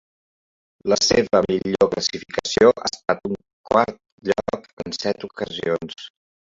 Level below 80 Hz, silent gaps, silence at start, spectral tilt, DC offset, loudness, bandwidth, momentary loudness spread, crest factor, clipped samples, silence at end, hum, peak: -52 dBFS; 3.53-3.64 s, 4.12-4.18 s, 4.73-4.77 s; 0.85 s; -3.5 dB/octave; under 0.1%; -21 LUFS; 7.8 kHz; 14 LU; 20 dB; under 0.1%; 0.5 s; none; -2 dBFS